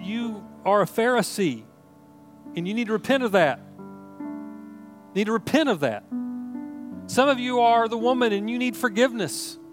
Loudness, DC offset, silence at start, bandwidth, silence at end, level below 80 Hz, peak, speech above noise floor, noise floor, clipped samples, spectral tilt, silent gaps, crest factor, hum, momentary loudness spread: -23 LUFS; under 0.1%; 0 s; 16.5 kHz; 0 s; -74 dBFS; -6 dBFS; 28 dB; -51 dBFS; under 0.1%; -4.5 dB/octave; none; 20 dB; none; 17 LU